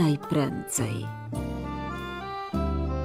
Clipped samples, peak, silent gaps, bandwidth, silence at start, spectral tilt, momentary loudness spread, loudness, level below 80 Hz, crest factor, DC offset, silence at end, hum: under 0.1%; -12 dBFS; none; 16 kHz; 0 s; -5.5 dB/octave; 8 LU; -30 LUFS; -38 dBFS; 16 dB; under 0.1%; 0 s; none